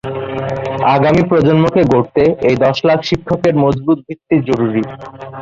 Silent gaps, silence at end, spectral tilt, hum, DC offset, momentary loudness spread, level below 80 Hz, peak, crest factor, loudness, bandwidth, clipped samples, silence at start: none; 0 s; -7.5 dB/octave; none; under 0.1%; 9 LU; -42 dBFS; 0 dBFS; 12 dB; -14 LUFS; 7.6 kHz; under 0.1%; 0.05 s